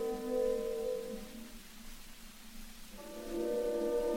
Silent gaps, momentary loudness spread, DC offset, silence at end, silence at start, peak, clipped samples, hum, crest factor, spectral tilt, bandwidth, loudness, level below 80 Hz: none; 18 LU; under 0.1%; 0 s; 0 s; -24 dBFS; under 0.1%; none; 14 dB; -4.5 dB/octave; 17 kHz; -37 LUFS; -52 dBFS